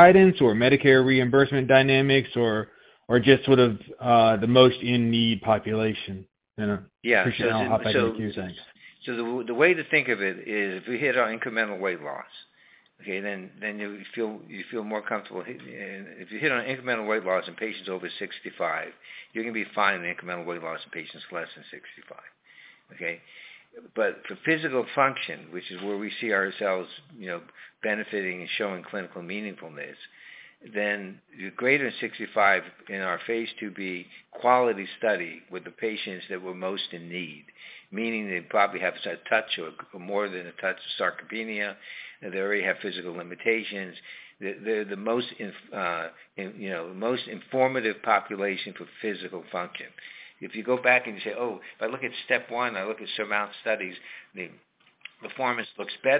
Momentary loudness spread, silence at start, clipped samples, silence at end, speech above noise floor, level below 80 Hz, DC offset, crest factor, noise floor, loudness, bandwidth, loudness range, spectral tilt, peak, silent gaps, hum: 19 LU; 0 s; under 0.1%; 0 s; 33 dB; -62 dBFS; under 0.1%; 26 dB; -59 dBFS; -26 LUFS; 4 kHz; 11 LU; -9 dB/octave; -2 dBFS; none; none